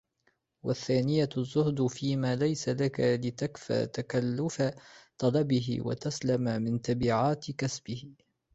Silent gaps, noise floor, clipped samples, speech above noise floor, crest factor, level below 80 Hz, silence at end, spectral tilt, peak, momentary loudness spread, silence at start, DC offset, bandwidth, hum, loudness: none; -74 dBFS; under 0.1%; 45 dB; 18 dB; -60 dBFS; 0.45 s; -6.5 dB/octave; -14 dBFS; 7 LU; 0.65 s; under 0.1%; 8.2 kHz; none; -30 LUFS